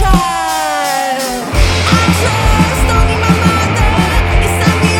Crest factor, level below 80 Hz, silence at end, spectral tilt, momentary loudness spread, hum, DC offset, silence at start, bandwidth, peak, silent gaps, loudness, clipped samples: 10 dB; -16 dBFS; 0 s; -4.5 dB/octave; 4 LU; none; under 0.1%; 0 s; 17.5 kHz; 0 dBFS; none; -12 LUFS; under 0.1%